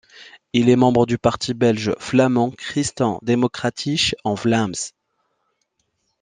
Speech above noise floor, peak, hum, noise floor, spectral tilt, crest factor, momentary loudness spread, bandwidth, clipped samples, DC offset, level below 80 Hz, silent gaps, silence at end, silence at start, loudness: 52 dB; -2 dBFS; none; -71 dBFS; -5 dB/octave; 18 dB; 8 LU; 9.8 kHz; under 0.1%; under 0.1%; -52 dBFS; none; 1.3 s; 0.2 s; -19 LUFS